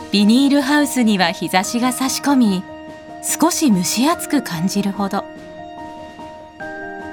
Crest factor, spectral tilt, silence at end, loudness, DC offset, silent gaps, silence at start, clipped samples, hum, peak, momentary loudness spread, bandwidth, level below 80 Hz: 16 dB; -4 dB/octave; 0 s; -17 LUFS; under 0.1%; none; 0 s; under 0.1%; none; -2 dBFS; 20 LU; 19.5 kHz; -56 dBFS